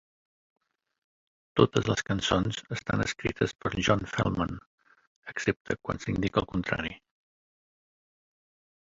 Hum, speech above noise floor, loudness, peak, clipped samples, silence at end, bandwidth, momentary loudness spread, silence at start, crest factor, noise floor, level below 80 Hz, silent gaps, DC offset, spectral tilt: none; over 61 dB; -29 LUFS; -6 dBFS; under 0.1%; 1.85 s; 7.8 kHz; 9 LU; 1.55 s; 26 dB; under -90 dBFS; -50 dBFS; 4.66-4.78 s, 5.07-5.23 s, 5.56-5.65 s; under 0.1%; -5.5 dB/octave